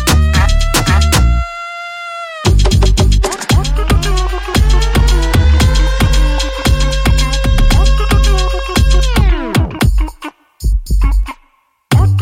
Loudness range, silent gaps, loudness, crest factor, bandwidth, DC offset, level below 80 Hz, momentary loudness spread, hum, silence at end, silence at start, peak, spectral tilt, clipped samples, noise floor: 2 LU; none; -13 LUFS; 10 dB; 16.5 kHz; under 0.1%; -12 dBFS; 10 LU; none; 0 s; 0 s; 0 dBFS; -5 dB/octave; under 0.1%; -54 dBFS